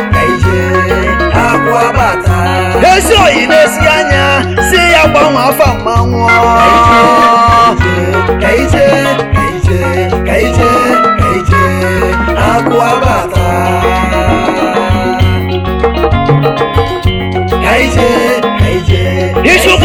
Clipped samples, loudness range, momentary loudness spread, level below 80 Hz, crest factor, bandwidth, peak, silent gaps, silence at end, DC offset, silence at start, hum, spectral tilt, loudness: 2%; 4 LU; 6 LU; -20 dBFS; 8 dB; 17.5 kHz; 0 dBFS; none; 0 s; 0.3%; 0 s; none; -5.5 dB/octave; -8 LUFS